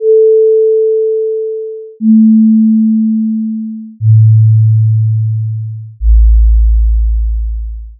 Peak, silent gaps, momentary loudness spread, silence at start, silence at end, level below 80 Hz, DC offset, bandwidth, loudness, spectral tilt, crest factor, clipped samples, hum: 0 dBFS; none; 13 LU; 0 s; 0.05 s; -14 dBFS; under 0.1%; 0.5 kHz; -10 LUFS; -21.5 dB/octave; 8 dB; under 0.1%; none